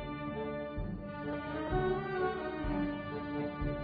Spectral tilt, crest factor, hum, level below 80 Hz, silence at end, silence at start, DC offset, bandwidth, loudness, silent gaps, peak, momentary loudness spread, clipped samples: -6 dB/octave; 16 dB; none; -46 dBFS; 0 s; 0 s; under 0.1%; 5 kHz; -37 LUFS; none; -20 dBFS; 6 LU; under 0.1%